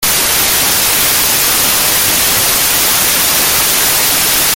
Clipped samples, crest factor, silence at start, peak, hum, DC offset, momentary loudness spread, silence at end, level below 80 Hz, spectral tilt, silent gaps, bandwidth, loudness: under 0.1%; 12 dB; 0 s; 0 dBFS; none; under 0.1%; 0 LU; 0 s; -36 dBFS; 0 dB/octave; none; over 20 kHz; -8 LUFS